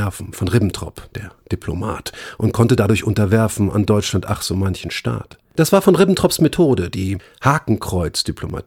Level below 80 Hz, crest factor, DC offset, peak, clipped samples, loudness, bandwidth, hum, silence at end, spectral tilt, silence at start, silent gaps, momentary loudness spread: -42 dBFS; 16 dB; under 0.1%; -2 dBFS; under 0.1%; -18 LUFS; 17 kHz; none; 0.05 s; -6 dB/octave; 0 s; none; 14 LU